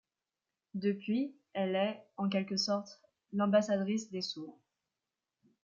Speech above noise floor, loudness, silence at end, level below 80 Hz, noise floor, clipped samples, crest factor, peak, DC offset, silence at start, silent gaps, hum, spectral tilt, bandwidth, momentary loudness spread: over 57 dB; -34 LUFS; 1.15 s; -84 dBFS; under -90 dBFS; under 0.1%; 18 dB; -18 dBFS; under 0.1%; 0.75 s; none; none; -5.5 dB/octave; 7.6 kHz; 12 LU